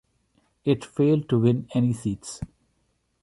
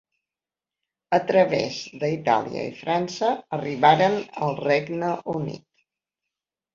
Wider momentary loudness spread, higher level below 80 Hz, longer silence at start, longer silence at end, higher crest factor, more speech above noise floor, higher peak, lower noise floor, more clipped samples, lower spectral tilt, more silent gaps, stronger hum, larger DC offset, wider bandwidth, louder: first, 15 LU vs 11 LU; first, -54 dBFS vs -66 dBFS; second, 0.65 s vs 1.1 s; second, 0.75 s vs 1.2 s; about the same, 18 dB vs 20 dB; second, 48 dB vs over 67 dB; second, -8 dBFS vs -4 dBFS; second, -71 dBFS vs under -90 dBFS; neither; first, -7.5 dB/octave vs -5.5 dB/octave; neither; neither; neither; first, 11.5 kHz vs 7.4 kHz; about the same, -24 LUFS vs -23 LUFS